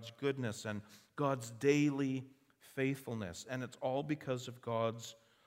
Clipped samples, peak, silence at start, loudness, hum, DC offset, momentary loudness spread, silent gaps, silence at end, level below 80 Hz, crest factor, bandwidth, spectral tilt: under 0.1%; -18 dBFS; 0 s; -38 LUFS; none; under 0.1%; 15 LU; none; 0.3 s; -76 dBFS; 20 dB; 16 kHz; -6 dB/octave